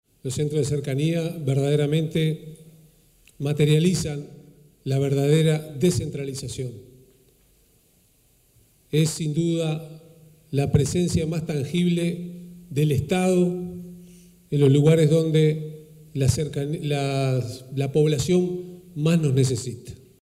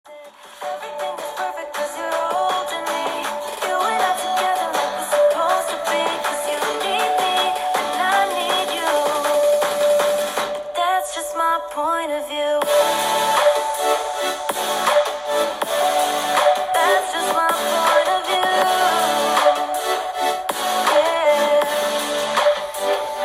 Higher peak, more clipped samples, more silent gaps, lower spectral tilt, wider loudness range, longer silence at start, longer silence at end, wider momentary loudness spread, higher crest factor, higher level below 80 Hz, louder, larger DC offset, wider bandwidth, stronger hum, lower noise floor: second, -8 dBFS vs -4 dBFS; neither; neither; first, -6.5 dB/octave vs -1 dB/octave; first, 7 LU vs 4 LU; first, 0.25 s vs 0.05 s; first, 0.3 s vs 0 s; first, 16 LU vs 7 LU; about the same, 16 dB vs 16 dB; first, -50 dBFS vs -60 dBFS; second, -23 LUFS vs -19 LUFS; neither; second, 14.5 kHz vs 16.5 kHz; neither; first, -61 dBFS vs -41 dBFS